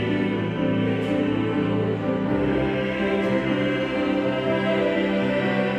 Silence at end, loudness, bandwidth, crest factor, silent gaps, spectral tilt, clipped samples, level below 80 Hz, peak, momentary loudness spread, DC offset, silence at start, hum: 0 s; -23 LUFS; 9.2 kHz; 12 dB; none; -7.5 dB/octave; under 0.1%; -48 dBFS; -10 dBFS; 2 LU; under 0.1%; 0 s; none